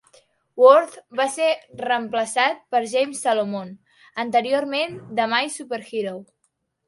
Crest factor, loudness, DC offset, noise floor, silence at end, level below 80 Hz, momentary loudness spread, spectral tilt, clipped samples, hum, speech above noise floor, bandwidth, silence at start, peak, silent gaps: 22 dB; -21 LUFS; under 0.1%; -72 dBFS; 0.65 s; -72 dBFS; 15 LU; -3 dB/octave; under 0.1%; none; 51 dB; 11.5 kHz; 0.55 s; 0 dBFS; none